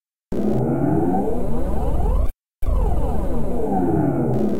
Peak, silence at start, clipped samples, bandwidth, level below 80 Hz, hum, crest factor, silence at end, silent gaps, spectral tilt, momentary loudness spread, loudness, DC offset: -8 dBFS; 0 s; under 0.1%; 15 kHz; -24 dBFS; none; 12 dB; 0 s; none; -9.5 dB/octave; 6 LU; -23 LUFS; 5%